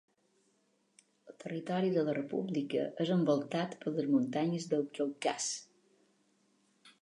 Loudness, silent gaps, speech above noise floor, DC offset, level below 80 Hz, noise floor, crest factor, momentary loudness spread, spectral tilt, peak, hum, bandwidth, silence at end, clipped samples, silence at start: -34 LUFS; none; 41 dB; under 0.1%; -86 dBFS; -75 dBFS; 18 dB; 6 LU; -5.5 dB/octave; -18 dBFS; none; 11 kHz; 0.1 s; under 0.1%; 1.25 s